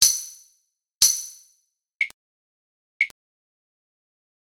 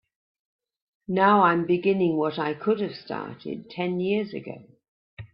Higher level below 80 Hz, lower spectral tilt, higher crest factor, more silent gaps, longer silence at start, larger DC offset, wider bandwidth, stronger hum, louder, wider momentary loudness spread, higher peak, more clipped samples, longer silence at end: about the same, -62 dBFS vs -66 dBFS; second, 4.5 dB/octave vs -10.5 dB/octave; first, 28 dB vs 20 dB; first, 1.96-2.00 s, 2.14-3.00 s vs 4.88-5.17 s; second, 0 s vs 1.1 s; neither; first, 18 kHz vs 5.6 kHz; neither; about the same, -22 LUFS vs -24 LUFS; second, 14 LU vs 17 LU; first, 0 dBFS vs -4 dBFS; neither; first, 1.4 s vs 0.1 s